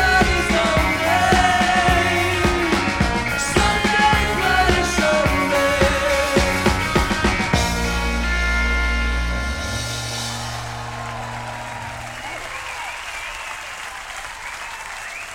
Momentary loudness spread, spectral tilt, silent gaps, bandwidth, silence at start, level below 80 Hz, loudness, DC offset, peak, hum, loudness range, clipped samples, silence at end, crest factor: 14 LU; -4 dB/octave; none; 17 kHz; 0 s; -28 dBFS; -19 LUFS; under 0.1%; -2 dBFS; none; 12 LU; under 0.1%; 0 s; 18 dB